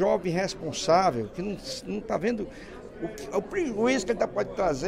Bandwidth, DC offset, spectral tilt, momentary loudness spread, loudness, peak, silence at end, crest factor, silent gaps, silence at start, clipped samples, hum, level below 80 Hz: 15.5 kHz; under 0.1%; -5 dB/octave; 14 LU; -28 LUFS; -10 dBFS; 0 s; 18 dB; none; 0 s; under 0.1%; none; -50 dBFS